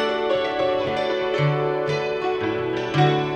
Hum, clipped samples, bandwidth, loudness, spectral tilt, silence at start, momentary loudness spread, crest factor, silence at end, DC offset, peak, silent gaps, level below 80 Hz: none; under 0.1%; 8.6 kHz; -22 LUFS; -6.5 dB/octave; 0 s; 4 LU; 16 dB; 0 s; under 0.1%; -6 dBFS; none; -54 dBFS